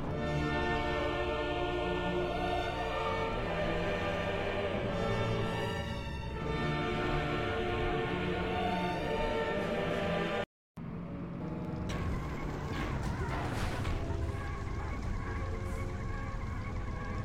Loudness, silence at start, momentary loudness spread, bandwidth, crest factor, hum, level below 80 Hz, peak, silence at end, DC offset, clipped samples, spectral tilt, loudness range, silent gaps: -35 LUFS; 0 s; 6 LU; 16 kHz; 14 dB; none; -42 dBFS; -20 dBFS; 0 s; 0.2%; under 0.1%; -6.5 dB/octave; 4 LU; 10.46-10.75 s